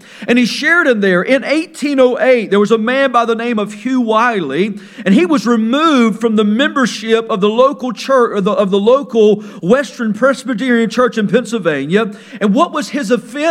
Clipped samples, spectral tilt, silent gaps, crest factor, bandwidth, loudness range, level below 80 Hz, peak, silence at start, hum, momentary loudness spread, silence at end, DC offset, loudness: under 0.1%; -5.5 dB/octave; none; 12 dB; 13 kHz; 2 LU; -64 dBFS; 0 dBFS; 0.15 s; none; 6 LU; 0 s; under 0.1%; -13 LUFS